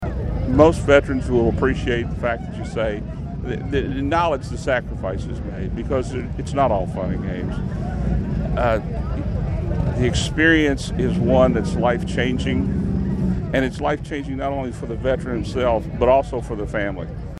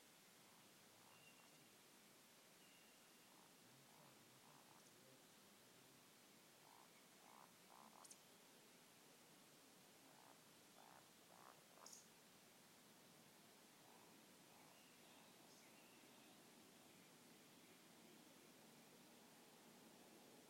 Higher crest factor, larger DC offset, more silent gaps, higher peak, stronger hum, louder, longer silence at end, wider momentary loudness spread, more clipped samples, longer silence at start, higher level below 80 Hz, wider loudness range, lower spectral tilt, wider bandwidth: about the same, 20 dB vs 20 dB; neither; neither; first, 0 dBFS vs -48 dBFS; neither; first, -21 LUFS vs -67 LUFS; about the same, 0 s vs 0 s; first, 11 LU vs 2 LU; neither; about the same, 0 s vs 0 s; first, -30 dBFS vs under -90 dBFS; first, 5 LU vs 2 LU; first, -6.5 dB/octave vs -2.5 dB/octave; second, 11.5 kHz vs 16 kHz